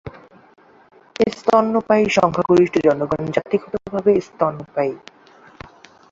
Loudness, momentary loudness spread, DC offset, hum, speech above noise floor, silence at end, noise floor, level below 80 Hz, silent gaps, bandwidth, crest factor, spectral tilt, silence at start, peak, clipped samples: -18 LUFS; 9 LU; under 0.1%; none; 27 dB; 1.15 s; -44 dBFS; -54 dBFS; none; 7.8 kHz; 18 dB; -6.5 dB/octave; 0.05 s; -2 dBFS; under 0.1%